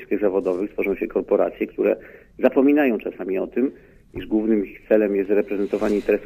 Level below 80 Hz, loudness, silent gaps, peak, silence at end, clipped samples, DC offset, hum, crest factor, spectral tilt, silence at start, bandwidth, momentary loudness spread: -52 dBFS; -22 LUFS; none; -4 dBFS; 0 s; under 0.1%; under 0.1%; none; 18 dB; -8 dB/octave; 0 s; 15 kHz; 9 LU